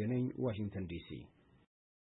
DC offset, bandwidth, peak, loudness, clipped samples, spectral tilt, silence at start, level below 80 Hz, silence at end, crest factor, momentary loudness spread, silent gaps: under 0.1%; 3.9 kHz; -26 dBFS; -40 LUFS; under 0.1%; -8.5 dB/octave; 0 s; -64 dBFS; 0.9 s; 14 dB; 15 LU; none